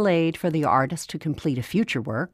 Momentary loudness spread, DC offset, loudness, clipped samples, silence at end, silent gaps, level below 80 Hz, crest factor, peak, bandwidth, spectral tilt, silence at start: 7 LU; under 0.1%; -24 LUFS; under 0.1%; 0.05 s; none; -58 dBFS; 16 dB; -8 dBFS; 15.5 kHz; -6 dB/octave; 0 s